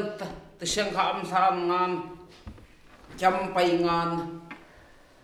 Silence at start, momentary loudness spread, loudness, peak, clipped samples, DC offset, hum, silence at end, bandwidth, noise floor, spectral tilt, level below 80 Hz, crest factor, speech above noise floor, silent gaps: 0 s; 22 LU; -26 LUFS; -8 dBFS; under 0.1%; under 0.1%; none; 0.6 s; 13.5 kHz; -54 dBFS; -4 dB/octave; -54 dBFS; 20 dB; 28 dB; none